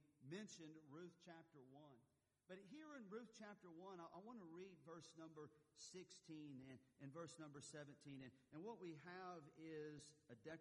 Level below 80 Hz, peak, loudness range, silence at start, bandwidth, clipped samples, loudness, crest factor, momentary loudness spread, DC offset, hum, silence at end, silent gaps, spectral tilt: under -90 dBFS; -44 dBFS; 3 LU; 0 s; 11 kHz; under 0.1%; -60 LUFS; 16 dB; 8 LU; under 0.1%; none; 0 s; none; -5 dB/octave